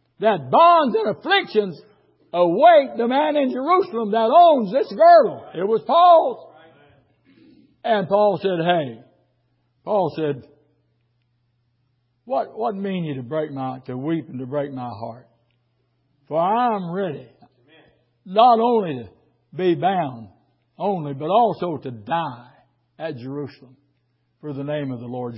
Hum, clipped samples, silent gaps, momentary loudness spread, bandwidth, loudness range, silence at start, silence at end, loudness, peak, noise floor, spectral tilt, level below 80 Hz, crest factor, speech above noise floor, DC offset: none; under 0.1%; none; 18 LU; 5.8 kHz; 13 LU; 0.2 s; 0 s; -19 LUFS; -2 dBFS; -68 dBFS; -10.5 dB/octave; -68 dBFS; 18 dB; 49 dB; under 0.1%